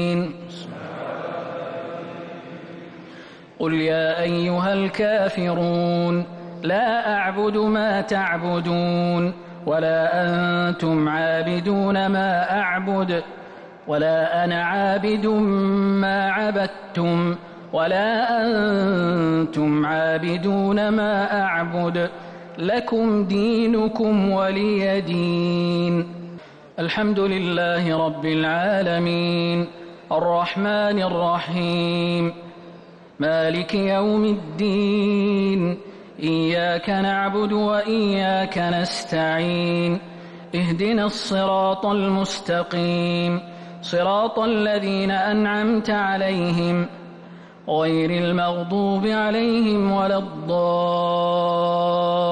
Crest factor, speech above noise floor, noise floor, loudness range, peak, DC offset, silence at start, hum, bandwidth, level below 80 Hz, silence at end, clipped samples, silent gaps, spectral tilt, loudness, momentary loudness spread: 10 dB; 23 dB; -44 dBFS; 2 LU; -12 dBFS; under 0.1%; 0 s; none; 9.8 kHz; -56 dBFS; 0 s; under 0.1%; none; -7 dB/octave; -21 LUFS; 11 LU